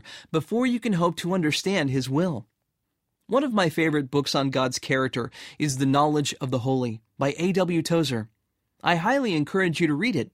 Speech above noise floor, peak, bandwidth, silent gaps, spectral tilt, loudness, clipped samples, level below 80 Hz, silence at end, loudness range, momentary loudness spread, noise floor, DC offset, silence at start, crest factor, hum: 55 dB; -8 dBFS; 16 kHz; none; -5.5 dB/octave; -25 LUFS; under 0.1%; -62 dBFS; 0.05 s; 1 LU; 6 LU; -79 dBFS; under 0.1%; 0.05 s; 18 dB; none